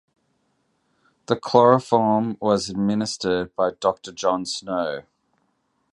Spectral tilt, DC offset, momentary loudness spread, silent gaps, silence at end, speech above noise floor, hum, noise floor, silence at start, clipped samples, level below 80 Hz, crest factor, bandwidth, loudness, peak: -5.5 dB/octave; under 0.1%; 10 LU; none; 0.95 s; 49 dB; none; -70 dBFS; 1.3 s; under 0.1%; -58 dBFS; 22 dB; 11 kHz; -22 LUFS; -2 dBFS